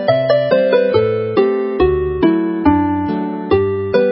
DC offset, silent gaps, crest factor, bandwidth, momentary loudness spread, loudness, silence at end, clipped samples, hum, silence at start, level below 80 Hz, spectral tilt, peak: under 0.1%; none; 14 dB; 5.8 kHz; 4 LU; -15 LUFS; 0 s; under 0.1%; none; 0 s; -34 dBFS; -12 dB/octave; 0 dBFS